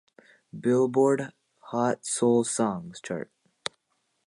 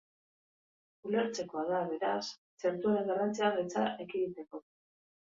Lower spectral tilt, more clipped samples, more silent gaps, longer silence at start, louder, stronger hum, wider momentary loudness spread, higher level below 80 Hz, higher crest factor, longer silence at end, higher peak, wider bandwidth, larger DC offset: about the same, -5 dB/octave vs -5 dB/octave; neither; second, none vs 2.38-2.57 s; second, 0.55 s vs 1.05 s; first, -27 LUFS vs -34 LUFS; neither; about the same, 14 LU vs 13 LU; first, -72 dBFS vs -78 dBFS; about the same, 18 dB vs 20 dB; first, 1.05 s vs 0.8 s; first, -10 dBFS vs -16 dBFS; first, 11.5 kHz vs 7.8 kHz; neither